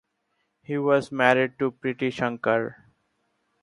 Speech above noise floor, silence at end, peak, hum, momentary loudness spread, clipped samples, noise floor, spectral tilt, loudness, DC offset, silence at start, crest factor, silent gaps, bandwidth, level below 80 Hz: 51 dB; 0.9 s; -2 dBFS; none; 8 LU; under 0.1%; -75 dBFS; -6.5 dB/octave; -24 LUFS; under 0.1%; 0.7 s; 24 dB; none; 11.5 kHz; -68 dBFS